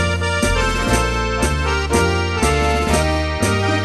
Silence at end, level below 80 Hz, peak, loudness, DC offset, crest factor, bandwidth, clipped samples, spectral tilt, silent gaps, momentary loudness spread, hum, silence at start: 0 s; -24 dBFS; -2 dBFS; -17 LUFS; under 0.1%; 16 dB; 12.5 kHz; under 0.1%; -4.5 dB/octave; none; 2 LU; none; 0 s